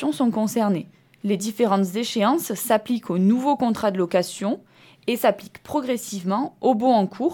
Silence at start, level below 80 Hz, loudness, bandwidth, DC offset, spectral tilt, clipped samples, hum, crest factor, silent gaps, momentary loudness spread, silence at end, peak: 0 s; -66 dBFS; -23 LUFS; 19 kHz; under 0.1%; -5.5 dB/octave; under 0.1%; none; 16 dB; none; 8 LU; 0 s; -6 dBFS